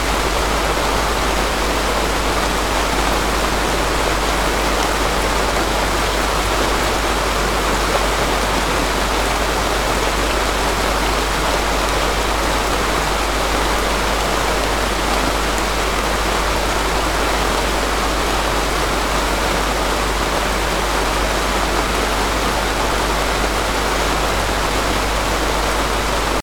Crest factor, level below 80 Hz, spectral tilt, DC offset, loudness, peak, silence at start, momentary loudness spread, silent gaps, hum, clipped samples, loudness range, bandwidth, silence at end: 16 dB; -24 dBFS; -3 dB/octave; 1%; -18 LUFS; -2 dBFS; 0 s; 1 LU; none; none; under 0.1%; 1 LU; 19.5 kHz; 0 s